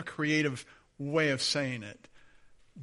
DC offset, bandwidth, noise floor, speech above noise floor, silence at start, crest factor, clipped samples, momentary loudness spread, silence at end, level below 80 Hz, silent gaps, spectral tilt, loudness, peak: under 0.1%; 11.5 kHz; -58 dBFS; 27 dB; 0 s; 18 dB; under 0.1%; 15 LU; 0 s; -68 dBFS; none; -4 dB/octave; -30 LUFS; -14 dBFS